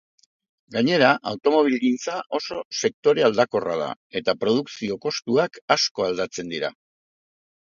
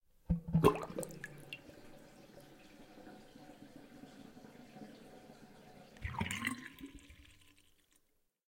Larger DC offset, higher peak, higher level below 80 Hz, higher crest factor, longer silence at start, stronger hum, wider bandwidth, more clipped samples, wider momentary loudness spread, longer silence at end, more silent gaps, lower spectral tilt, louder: neither; first, -2 dBFS vs -12 dBFS; second, -66 dBFS vs -56 dBFS; second, 22 dB vs 30 dB; first, 0.7 s vs 0.3 s; neither; second, 7.4 kHz vs 16.5 kHz; neither; second, 10 LU vs 24 LU; second, 0.95 s vs 1.35 s; first, 2.65-2.71 s, 2.94-3.03 s, 3.96-4.10 s, 5.62-5.68 s, 5.91-5.95 s vs none; second, -4 dB/octave vs -6 dB/octave; first, -23 LUFS vs -38 LUFS